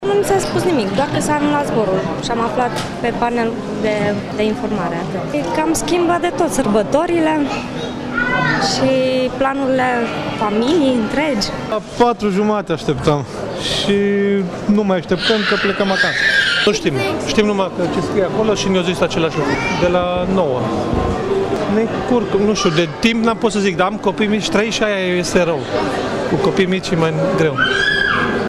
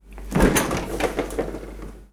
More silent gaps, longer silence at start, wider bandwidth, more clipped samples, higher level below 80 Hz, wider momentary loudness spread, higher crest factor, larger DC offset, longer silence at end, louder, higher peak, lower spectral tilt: neither; about the same, 0 s vs 0.05 s; second, 14 kHz vs over 20 kHz; neither; second, -38 dBFS vs -32 dBFS; second, 5 LU vs 18 LU; second, 14 dB vs 20 dB; neither; about the same, 0 s vs 0.05 s; first, -16 LUFS vs -23 LUFS; about the same, -2 dBFS vs -4 dBFS; about the same, -5 dB/octave vs -4.5 dB/octave